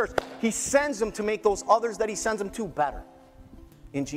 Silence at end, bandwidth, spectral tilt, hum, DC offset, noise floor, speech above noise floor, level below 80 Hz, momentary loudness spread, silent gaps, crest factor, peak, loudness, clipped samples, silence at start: 0 s; 16 kHz; -3.5 dB/octave; none; under 0.1%; -49 dBFS; 22 dB; -50 dBFS; 9 LU; none; 22 dB; -4 dBFS; -27 LUFS; under 0.1%; 0 s